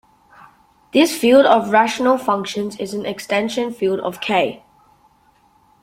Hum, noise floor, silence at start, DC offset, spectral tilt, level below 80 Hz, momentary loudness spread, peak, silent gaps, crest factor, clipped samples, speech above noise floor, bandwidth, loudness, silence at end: none; -56 dBFS; 0.95 s; under 0.1%; -4 dB/octave; -62 dBFS; 12 LU; 0 dBFS; none; 18 dB; under 0.1%; 39 dB; 16.5 kHz; -17 LUFS; 1.25 s